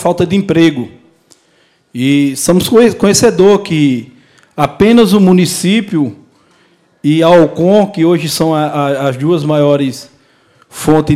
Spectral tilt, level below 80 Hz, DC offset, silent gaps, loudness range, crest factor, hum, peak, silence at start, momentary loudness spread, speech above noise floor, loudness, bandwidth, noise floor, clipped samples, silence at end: -5.5 dB/octave; -42 dBFS; under 0.1%; none; 3 LU; 10 dB; none; 0 dBFS; 0 s; 11 LU; 43 dB; -10 LUFS; 16 kHz; -53 dBFS; 0.3%; 0 s